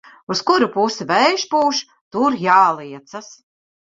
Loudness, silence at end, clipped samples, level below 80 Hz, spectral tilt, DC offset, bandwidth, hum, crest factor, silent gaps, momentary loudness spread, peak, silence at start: -17 LUFS; 0.55 s; under 0.1%; -64 dBFS; -3.5 dB/octave; under 0.1%; 7.8 kHz; none; 16 dB; 2.01-2.11 s; 19 LU; -2 dBFS; 0.3 s